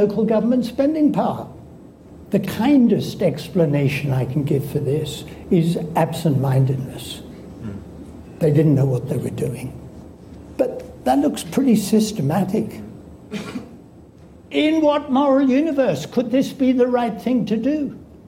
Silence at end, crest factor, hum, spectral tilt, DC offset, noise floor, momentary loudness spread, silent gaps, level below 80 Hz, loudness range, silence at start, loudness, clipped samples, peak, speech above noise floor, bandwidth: 0.1 s; 14 dB; none; -7 dB/octave; under 0.1%; -44 dBFS; 17 LU; none; -48 dBFS; 4 LU; 0 s; -19 LUFS; under 0.1%; -6 dBFS; 26 dB; 16.5 kHz